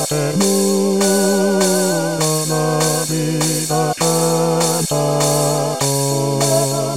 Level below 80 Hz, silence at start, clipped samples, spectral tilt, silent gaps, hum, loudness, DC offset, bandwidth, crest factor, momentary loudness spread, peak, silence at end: -58 dBFS; 0 s; under 0.1%; -4 dB/octave; none; none; -16 LUFS; 0.7%; 16.5 kHz; 14 dB; 3 LU; -2 dBFS; 0 s